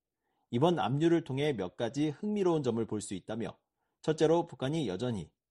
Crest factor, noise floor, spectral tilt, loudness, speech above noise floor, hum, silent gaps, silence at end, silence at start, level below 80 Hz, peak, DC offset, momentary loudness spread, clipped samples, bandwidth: 18 dB; -82 dBFS; -6.5 dB/octave; -32 LUFS; 51 dB; none; none; 0.25 s; 0.5 s; -66 dBFS; -14 dBFS; under 0.1%; 10 LU; under 0.1%; 11.5 kHz